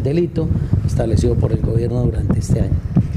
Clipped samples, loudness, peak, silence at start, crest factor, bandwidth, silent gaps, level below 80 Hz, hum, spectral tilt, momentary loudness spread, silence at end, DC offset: under 0.1%; -18 LUFS; -2 dBFS; 0 s; 14 dB; 11.5 kHz; none; -26 dBFS; none; -8.5 dB/octave; 2 LU; 0 s; under 0.1%